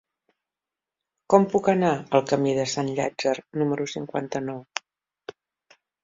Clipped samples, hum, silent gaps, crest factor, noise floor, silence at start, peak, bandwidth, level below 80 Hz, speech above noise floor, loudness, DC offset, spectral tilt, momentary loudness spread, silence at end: under 0.1%; none; none; 24 dB; -89 dBFS; 1.3 s; -2 dBFS; 7.8 kHz; -66 dBFS; 66 dB; -24 LUFS; under 0.1%; -5.5 dB/octave; 14 LU; 1.25 s